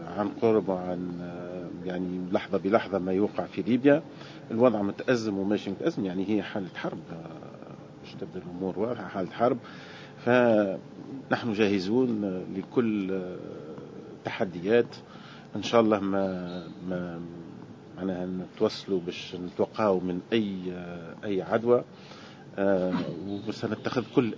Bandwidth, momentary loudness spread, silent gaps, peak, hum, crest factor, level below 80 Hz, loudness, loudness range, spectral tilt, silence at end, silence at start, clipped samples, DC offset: 7.6 kHz; 18 LU; none; -6 dBFS; none; 22 dB; -62 dBFS; -28 LUFS; 6 LU; -7 dB/octave; 0 s; 0 s; under 0.1%; under 0.1%